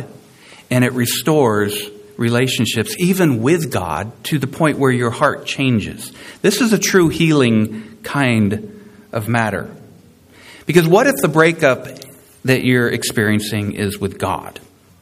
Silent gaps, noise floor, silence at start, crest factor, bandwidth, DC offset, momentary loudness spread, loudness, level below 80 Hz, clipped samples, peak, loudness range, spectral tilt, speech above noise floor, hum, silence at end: none; -45 dBFS; 0 s; 16 dB; 15.5 kHz; under 0.1%; 14 LU; -16 LUFS; -50 dBFS; under 0.1%; 0 dBFS; 3 LU; -5 dB/octave; 30 dB; none; 0.5 s